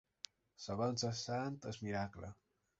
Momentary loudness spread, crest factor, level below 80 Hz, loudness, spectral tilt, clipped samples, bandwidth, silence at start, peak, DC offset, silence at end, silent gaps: 16 LU; 20 dB; -66 dBFS; -42 LUFS; -5 dB/octave; under 0.1%; 8 kHz; 0.6 s; -22 dBFS; under 0.1%; 0.45 s; none